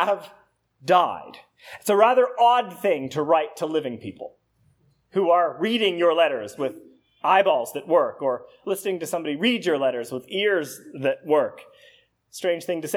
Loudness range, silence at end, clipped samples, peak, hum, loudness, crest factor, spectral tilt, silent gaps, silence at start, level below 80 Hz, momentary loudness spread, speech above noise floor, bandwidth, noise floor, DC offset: 4 LU; 0 s; under 0.1%; -4 dBFS; none; -23 LUFS; 20 dB; -4 dB/octave; none; 0 s; -76 dBFS; 13 LU; 41 dB; 16.5 kHz; -63 dBFS; under 0.1%